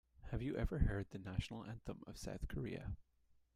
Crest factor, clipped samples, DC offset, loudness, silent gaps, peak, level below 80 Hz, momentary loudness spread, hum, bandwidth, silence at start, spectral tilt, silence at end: 22 dB; under 0.1%; under 0.1%; -45 LUFS; none; -22 dBFS; -48 dBFS; 11 LU; none; 15 kHz; 0.2 s; -7 dB/octave; 0.25 s